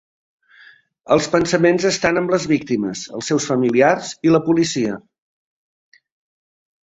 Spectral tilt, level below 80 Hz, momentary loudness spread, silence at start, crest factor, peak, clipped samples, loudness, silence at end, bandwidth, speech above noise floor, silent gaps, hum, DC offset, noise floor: -5 dB/octave; -54 dBFS; 7 LU; 1.1 s; 18 dB; -2 dBFS; under 0.1%; -18 LUFS; 1.85 s; 8 kHz; 32 dB; none; none; under 0.1%; -49 dBFS